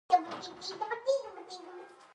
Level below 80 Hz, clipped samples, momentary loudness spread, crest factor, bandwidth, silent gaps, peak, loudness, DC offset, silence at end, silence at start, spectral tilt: -82 dBFS; under 0.1%; 17 LU; 22 dB; 10 kHz; none; -12 dBFS; -34 LUFS; under 0.1%; 0.1 s; 0.1 s; -2.5 dB/octave